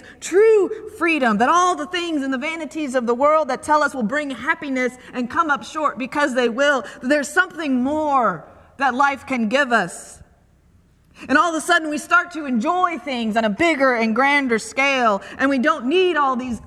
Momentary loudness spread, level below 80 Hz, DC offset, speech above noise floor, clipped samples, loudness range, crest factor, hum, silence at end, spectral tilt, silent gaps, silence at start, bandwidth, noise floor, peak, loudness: 7 LU; -56 dBFS; under 0.1%; 36 dB; under 0.1%; 3 LU; 18 dB; none; 0 s; -4 dB/octave; none; 0.05 s; 14 kHz; -55 dBFS; -2 dBFS; -19 LUFS